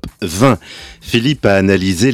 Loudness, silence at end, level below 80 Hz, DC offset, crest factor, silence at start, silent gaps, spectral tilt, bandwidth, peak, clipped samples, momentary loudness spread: -14 LUFS; 0 s; -40 dBFS; under 0.1%; 14 dB; 0.05 s; none; -5.5 dB/octave; 16.5 kHz; 0 dBFS; under 0.1%; 13 LU